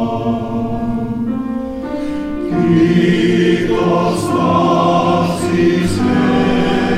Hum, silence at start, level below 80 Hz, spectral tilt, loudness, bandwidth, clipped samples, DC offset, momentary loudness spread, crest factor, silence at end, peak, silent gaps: none; 0 s; -36 dBFS; -6.5 dB/octave; -15 LUFS; 13.5 kHz; under 0.1%; under 0.1%; 9 LU; 12 dB; 0 s; -2 dBFS; none